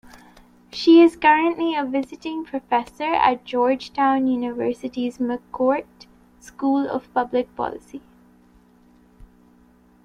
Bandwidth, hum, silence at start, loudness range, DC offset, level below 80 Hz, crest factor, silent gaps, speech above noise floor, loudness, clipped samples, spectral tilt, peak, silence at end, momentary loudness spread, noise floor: 10.5 kHz; none; 0.15 s; 8 LU; under 0.1%; -58 dBFS; 20 dB; none; 34 dB; -21 LUFS; under 0.1%; -5 dB/octave; -2 dBFS; 2.05 s; 14 LU; -54 dBFS